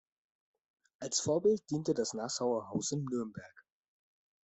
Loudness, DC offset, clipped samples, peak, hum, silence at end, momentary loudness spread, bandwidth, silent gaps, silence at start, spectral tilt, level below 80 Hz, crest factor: -34 LUFS; under 0.1%; under 0.1%; -18 dBFS; none; 0.85 s; 11 LU; 8.4 kHz; none; 1 s; -4.5 dB/octave; -74 dBFS; 18 dB